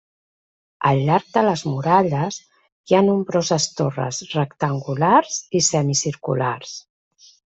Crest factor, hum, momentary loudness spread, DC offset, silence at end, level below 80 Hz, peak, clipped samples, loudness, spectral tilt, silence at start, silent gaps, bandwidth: 18 dB; none; 8 LU; under 0.1%; 0.75 s; -60 dBFS; -2 dBFS; under 0.1%; -20 LUFS; -4.5 dB/octave; 0.8 s; 2.72-2.84 s; 8.2 kHz